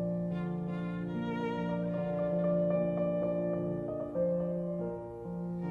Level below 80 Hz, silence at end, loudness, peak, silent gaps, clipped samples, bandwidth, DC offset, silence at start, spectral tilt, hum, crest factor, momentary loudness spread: -60 dBFS; 0 s; -34 LUFS; -20 dBFS; none; under 0.1%; 4.5 kHz; under 0.1%; 0 s; -10 dB/octave; none; 14 dB; 7 LU